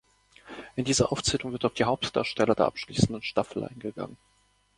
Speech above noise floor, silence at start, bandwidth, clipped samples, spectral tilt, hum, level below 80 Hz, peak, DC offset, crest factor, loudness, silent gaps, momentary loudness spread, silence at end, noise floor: 25 dB; 0.45 s; 11.5 kHz; under 0.1%; -4.5 dB/octave; none; -52 dBFS; -6 dBFS; under 0.1%; 24 dB; -28 LUFS; none; 13 LU; 0.65 s; -53 dBFS